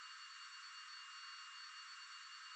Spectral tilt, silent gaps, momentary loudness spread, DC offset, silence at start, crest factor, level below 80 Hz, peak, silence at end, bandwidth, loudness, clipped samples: 7.5 dB/octave; none; 1 LU; under 0.1%; 0 s; 12 dB; under -90 dBFS; -42 dBFS; 0 s; 9.6 kHz; -52 LUFS; under 0.1%